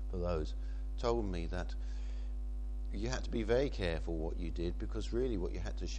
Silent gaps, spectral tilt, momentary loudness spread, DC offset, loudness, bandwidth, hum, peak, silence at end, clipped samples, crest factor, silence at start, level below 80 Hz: none; -6.5 dB/octave; 9 LU; under 0.1%; -39 LUFS; 8.6 kHz; none; -20 dBFS; 0 s; under 0.1%; 18 dB; 0 s; -40 dBFS